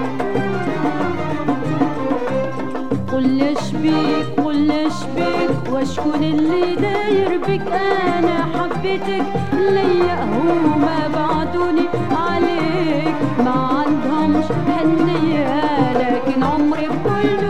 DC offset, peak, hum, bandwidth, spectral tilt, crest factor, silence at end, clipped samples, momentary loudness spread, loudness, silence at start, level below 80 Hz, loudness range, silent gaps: 4%; -2 dBFS; none; 10 kHz; -7 dB/octave; 14 dB; 0 s; under 0.1%; 5 LU; -18 LUFS; 0 s; -46 dBFS; 2 LU; none